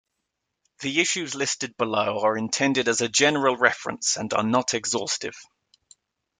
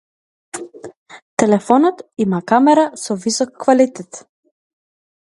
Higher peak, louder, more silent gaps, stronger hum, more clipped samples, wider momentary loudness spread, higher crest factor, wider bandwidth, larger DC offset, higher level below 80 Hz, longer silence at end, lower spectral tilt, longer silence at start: about the same, -2 dBFS vs 0 dBFS; second, -23 LUFS vs -16 LUFS; second, none vs 0.96-1.06 s, 1.22-1.37 s; neither; neither; second, 7 LU vs 21 LU; about the same, 22 dB vs 18 dB; about the same, 10.5 kHz vs 11.5 kHz; neither; second, -68 dBFS vs -62 dBFS; about the same, 0.95 s vs 1.05 s; second, -2.5 dB/octave vs -5 dB/octave; first, 0.8 s vs 0.55 s